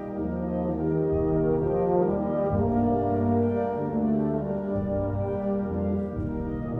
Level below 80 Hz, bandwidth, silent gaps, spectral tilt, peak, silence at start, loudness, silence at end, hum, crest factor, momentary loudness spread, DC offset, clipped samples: -42 dBFS; 3.7 kHz; none; -12 dB/octave; -10 dBFS; 0 s; -26 LUFS; 0 s; none; 16 dB; 5 LU; under 0.1%; under 0.1%